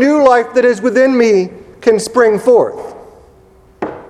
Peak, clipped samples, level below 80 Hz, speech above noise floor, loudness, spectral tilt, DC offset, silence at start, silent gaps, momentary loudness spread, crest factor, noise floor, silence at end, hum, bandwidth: 0 dBFS; under 0.1%; -52 dBFS; 34 dB; -11 LUFS; -5 dB/octave; under 0.1%; 0 s; none; 16 LU; 12 dB; -45 dBFS; 0.05 s; none; 13.5 kHz